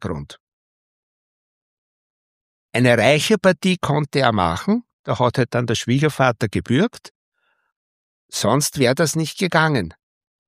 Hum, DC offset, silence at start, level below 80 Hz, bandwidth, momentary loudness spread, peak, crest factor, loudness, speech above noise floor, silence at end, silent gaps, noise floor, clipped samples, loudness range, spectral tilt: none; under 0.1%; 0 s; -50 dBFS; 15.5 kHz; 9 LU; -2 dBFS; 20 dB; -19 LUFS; over 72 dB; 0.55 s; 0.40-2.69 s, 4.93-5.04 s, 7.11-7.32 s, 7.76-8.29 s; under -90 dBFS; under 0.1%; 4 LU; -5 dB/octave